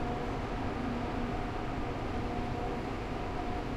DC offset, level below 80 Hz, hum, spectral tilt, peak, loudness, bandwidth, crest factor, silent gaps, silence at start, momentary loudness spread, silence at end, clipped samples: under 0.1%; -42 dBFS; none; -7 dB/octave; -22 dBFS; -36 LUFS; 12.5 kHz; 12 dB; none; 0 s; 2 LU; 0 s; under 0.1%